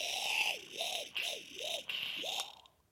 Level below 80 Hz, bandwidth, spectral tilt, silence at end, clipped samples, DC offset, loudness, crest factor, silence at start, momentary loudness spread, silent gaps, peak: -80 dBFS; 17 kHz; 1 dB/octave; 0.3 s; under 0.1%; under 0.1%; -37 LUFS; 20 dB; 0 s; 7 LU; none; -18 dBFS